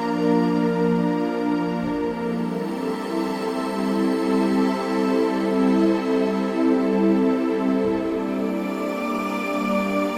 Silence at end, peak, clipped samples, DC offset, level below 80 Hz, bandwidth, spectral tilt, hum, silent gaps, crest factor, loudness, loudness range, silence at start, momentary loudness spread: 0 s; -8 dBFS; under 0.1%; under 0.1%; -56 dBFS; 16 kHz; -7 dB/octave; none; none; 14 dB; -22 LUFS; 3 LU; 0 s; 6 LU